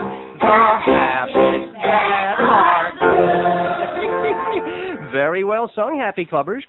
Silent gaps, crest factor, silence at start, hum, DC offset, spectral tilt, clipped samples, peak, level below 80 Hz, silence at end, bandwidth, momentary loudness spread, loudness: none; 16 dB; 0 s; none; under 0.1%; -8 dB/octave; under 0.1%; 0 dBFS; -50 dBFS; 0.05 s; 4.2 kHz; 9 LU; -17 LUFS